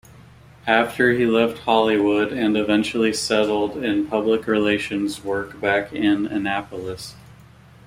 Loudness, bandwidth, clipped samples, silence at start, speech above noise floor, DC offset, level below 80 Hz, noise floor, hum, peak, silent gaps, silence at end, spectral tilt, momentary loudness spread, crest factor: -20 LUFS; 16 kHz; under 0.1%; 0.65 s; 27 dB; under 0.1%; -54 dBFS; -47 dBFS; none; -2 dBFS; none; 0.55 s; -4.5 dB/octave; 9 LU; 18 dB